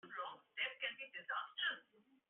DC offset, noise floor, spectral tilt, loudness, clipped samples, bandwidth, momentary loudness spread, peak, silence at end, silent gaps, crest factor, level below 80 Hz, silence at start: under 0.1%; -73 dBFS; 3.5 dB/octave; -44 LUFS; under 0.1%; 4 kHz; 8 LU; -28 dBFS; 0.5 s; none; 20 dB; under -90 dBFS; 0.05 s